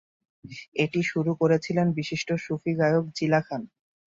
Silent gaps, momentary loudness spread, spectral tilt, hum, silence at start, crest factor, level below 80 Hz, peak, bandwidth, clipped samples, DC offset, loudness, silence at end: 0.68-0.72 s; 12 LU; -6.5 dB/octave; none; 0.45 s; 18 dB; -66 dBFS; -10 dBFS; 7.6 kHz; under 0.1%; under 0.1%; -26 LUFS; 0.5 s